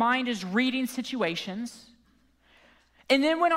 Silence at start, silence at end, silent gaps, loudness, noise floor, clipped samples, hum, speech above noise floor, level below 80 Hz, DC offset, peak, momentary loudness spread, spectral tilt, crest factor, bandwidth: 0 s; 0 s; none; -27 LUFS; -64 dBFS; under 0.1%; none; 37 dB; -70 dBFS; under 0.1%; -10 dBFS; 12 LU; -4 dB/octave; 18 dB; 16 kHz